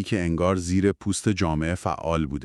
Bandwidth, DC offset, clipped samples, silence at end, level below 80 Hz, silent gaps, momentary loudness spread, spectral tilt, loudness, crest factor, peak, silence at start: 12.5 kHz; under 0.1%; under 0.1%; 0 s; -44 dBFS; none; 3 LU; -6 dB/octave; -25 LUFS; 16 dB; -8 dBFS; 0 s